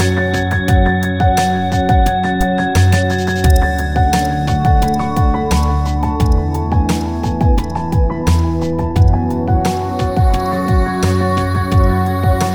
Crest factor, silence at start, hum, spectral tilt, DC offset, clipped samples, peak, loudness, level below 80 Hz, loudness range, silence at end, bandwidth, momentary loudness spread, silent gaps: 12 dB; 0 s; none; -6.5 dB/octave; under 0.1%; under 0.1%; 0 dBFS; -15 LUFS; -18 dBFS; 2 LU; 0 s; 19.5 kHz; 4 LU; none